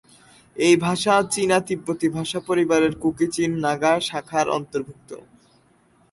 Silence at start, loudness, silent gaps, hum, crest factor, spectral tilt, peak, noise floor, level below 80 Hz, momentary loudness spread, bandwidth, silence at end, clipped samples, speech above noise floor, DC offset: 0.55 s; -21 LUFS; none; none; 18 dB; -4.5 dB/octave; -6 dBFS; -59 dBFS; -58 dBFS; 13 LU; 11.5 kHz; 0.95 s; under 0.1%; 37 dB; under 0.1%